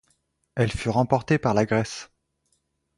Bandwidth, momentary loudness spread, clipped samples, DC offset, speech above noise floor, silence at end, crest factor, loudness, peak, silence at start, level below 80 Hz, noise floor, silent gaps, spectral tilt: 11.5 kHz; 12 LU; under 0.1%; under 0.1%; 50 dB; 0.95 s; 20 dB; -24 LUFS; -4 dBFS; 0.55 s; -48 dBFS; -72 dBFS; none; -6.5 dB/octave